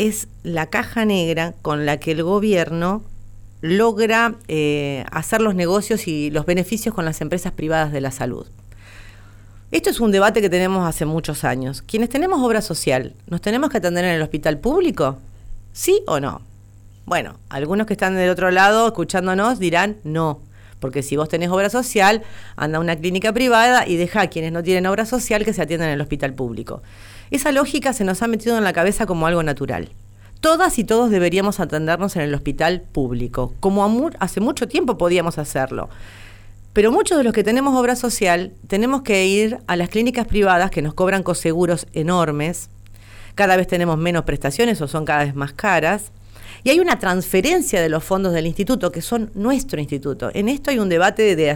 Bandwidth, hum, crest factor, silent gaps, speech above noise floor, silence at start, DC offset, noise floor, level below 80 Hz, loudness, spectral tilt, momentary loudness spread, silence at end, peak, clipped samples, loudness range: over 20 kHz; none; 14 dB; none; 25 dB; 0 s; under 0.1%; -43 dBFS; -38 dBFS; -19 LUFS; -5 dB/octave; 9 LU; 0 s; -4 dBFS; under 0.1%; 3 LU